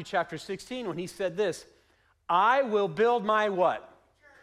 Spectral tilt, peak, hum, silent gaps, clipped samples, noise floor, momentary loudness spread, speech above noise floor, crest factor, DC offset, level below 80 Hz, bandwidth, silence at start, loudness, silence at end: -5 dB/octave; -12 dBFS; none; none; under 0.1%; -67 dBFS; 14 LU; 39 dB; 16 dB; under 0.1%; -68 dBFS; 14 kHz; 0 s; -28 LUFS; 0.55 s